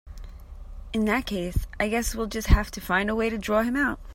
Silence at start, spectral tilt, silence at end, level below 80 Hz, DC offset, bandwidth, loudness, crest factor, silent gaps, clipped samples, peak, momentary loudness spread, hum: 0.05 s; -5 dB/octave; 0 s; -32 dBFS; under 0.1%; 16.5 kHz; -26 LUFS; 20 dB; none; under 0.1%; -6 dBFS; 21 LU; none